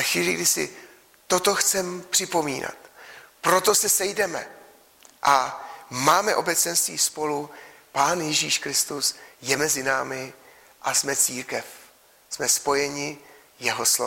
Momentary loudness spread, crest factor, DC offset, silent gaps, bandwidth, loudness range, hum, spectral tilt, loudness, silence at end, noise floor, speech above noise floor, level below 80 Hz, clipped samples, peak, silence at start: 14 LU; 20 dB; under 0.1%; none; 16.5 kHz; 3 LU; none; -1 dB/octave; -23 LUFS; 0 s; -54 dBFS; 30 dB; -64 dBFS; under 0.1%; -4 dBFS; 0 s